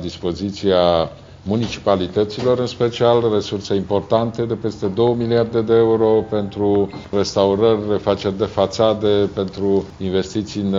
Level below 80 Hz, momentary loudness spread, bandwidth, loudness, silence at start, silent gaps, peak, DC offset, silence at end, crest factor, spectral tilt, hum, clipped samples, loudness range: -46 dBFS; 7 LU; 7.6 kHz; -18 LUFS; 0 s; none; 0 dBFS; under 0.1%; 0 s; 16 dB; -6 dB/octave; none; under 0.1%; 2 LU